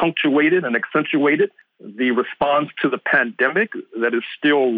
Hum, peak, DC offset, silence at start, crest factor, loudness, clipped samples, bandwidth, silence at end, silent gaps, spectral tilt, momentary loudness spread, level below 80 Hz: none; -6 dBFS; under 0.1%; 0 s; 14 dB; -19 LUFS; under 0.1%; 4.7 kHz; 0 s; none; -8.5 dB/octave; 6 LU; -62 dBFS